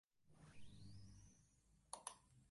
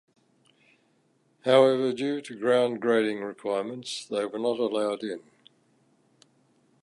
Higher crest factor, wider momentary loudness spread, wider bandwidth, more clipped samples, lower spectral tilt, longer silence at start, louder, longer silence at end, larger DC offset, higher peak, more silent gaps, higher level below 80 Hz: first, 28 dB vs 22 dB; about the same, 13 LU vs 13 LU; about the same, 11.5 kHz vs 11.5 kHz; neither; second, -3 dB/octave vs -5 dB/octave; second, 0.15 s vs 1.45 s; second, -60 LUFS vs -26 LUFS; second, 0 s vs 1.65 s; neither; second, -32 dBFS vs -6 dBFS; neither; first, -74 dBFS vs -82 dBFS